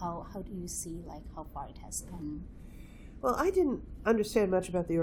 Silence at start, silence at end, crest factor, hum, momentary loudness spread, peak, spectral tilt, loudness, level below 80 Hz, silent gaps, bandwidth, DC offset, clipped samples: 0 s; 0 s; 20 dB; none; 19 LU; -14 dBFS; -5.5 dB/octave; -33 LUFS; -48 dBFS; none; 19 kHz; under 0.1%; under 0.1%